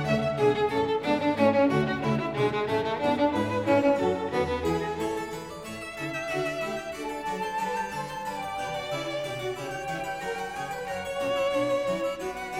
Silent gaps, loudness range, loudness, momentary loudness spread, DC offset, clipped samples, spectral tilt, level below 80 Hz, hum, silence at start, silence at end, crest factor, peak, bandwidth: none; 7 LU; -28 LUFS; 10 LU; under 0.1%; under 0.1%; -5.5 dB/octave; -54 dBFS; none; 0 s; 0 s; 18 dB; -10 dBFS; 16.5 kHz